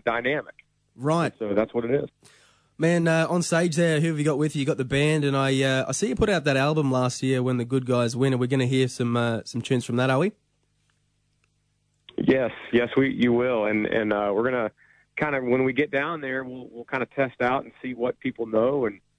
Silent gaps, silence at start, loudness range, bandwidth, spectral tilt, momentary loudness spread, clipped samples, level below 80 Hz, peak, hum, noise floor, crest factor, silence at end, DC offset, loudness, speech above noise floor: none; 0.05 s; 4 LU; 11 kHz; -6 dB/octave; 7 LU; under 0.1%; -54 dBFS; -10 dBFS; 50 Hz at -50 dBFS; -70 dBFS; 16 dB; 0.2 s; under 0.1%; -24 LUFS; 46 dB